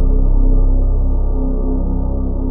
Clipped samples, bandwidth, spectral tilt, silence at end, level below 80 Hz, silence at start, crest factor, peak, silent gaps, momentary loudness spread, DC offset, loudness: under 0.1%; 1.3 kHz; -15 dB/octave; 0 s; -12 dBFS; 0 s; 8 dB; -4 dBFS; none; 4 LU; under 0.1%; -19 LUFS